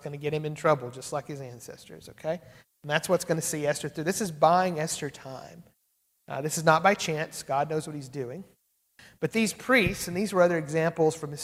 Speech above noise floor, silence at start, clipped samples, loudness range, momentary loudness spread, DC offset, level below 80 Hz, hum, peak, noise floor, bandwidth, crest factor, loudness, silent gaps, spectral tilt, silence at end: 45 dB; 0 s; under 0.1%; 4 LU; 18 LU; under 0.1%; -60 dBFS; none; -6 dBFS; -73 dBFS; 16 kHz; 24 dB; -27 LUFS; none; -4.5 dB/octave; 0 s